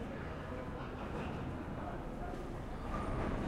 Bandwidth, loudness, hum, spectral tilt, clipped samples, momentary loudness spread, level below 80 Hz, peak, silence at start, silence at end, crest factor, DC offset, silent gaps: 14 kHz; -43 LUFS; none; -7.5 dB/octave; under 0.1%; 5 LU; -46 dBFS; -26 dBFS; 0 s; 0 s; 16 dB; under 0.1%; none